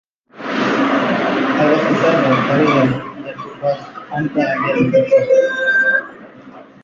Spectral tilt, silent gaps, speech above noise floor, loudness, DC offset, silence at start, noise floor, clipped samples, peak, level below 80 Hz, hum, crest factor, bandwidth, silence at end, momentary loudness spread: -6.5 dB/octave; none; 24 dB; -15 LUFS; under 0.1%; 0.35 s; -39 dBFS; under 0.1%; -2 dBFS; -54 dBFS; none; 14 dB; 7.4 kHz; 0.2 s; 13 LU